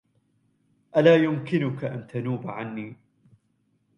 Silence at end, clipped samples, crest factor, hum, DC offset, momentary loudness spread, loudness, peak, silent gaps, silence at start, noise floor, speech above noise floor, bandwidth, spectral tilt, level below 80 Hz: 1.05 s; under 0.1%; 20 dB; none; under 0.1%; 16 LU; -24 LUFS; -6 dBFS; none; 0.95 s; -70 dBFS; 46 dB; 7 kHz; -8 dB/octave; -68 dBFS